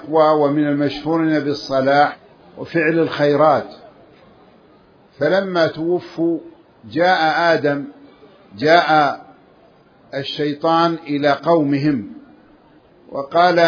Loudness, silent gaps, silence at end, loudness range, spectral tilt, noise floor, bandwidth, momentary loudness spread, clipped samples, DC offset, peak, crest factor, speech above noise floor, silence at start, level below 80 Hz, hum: -17 LUFS; none; 0 s; 3 LU; -6.5 dB/octave; -50 dBFS; 5.4 kHz; 13 LU; under 0.1%; under 0.1%; 0 dBFS; 18 dB; 34 dB; 0 s; -60 dBFS; none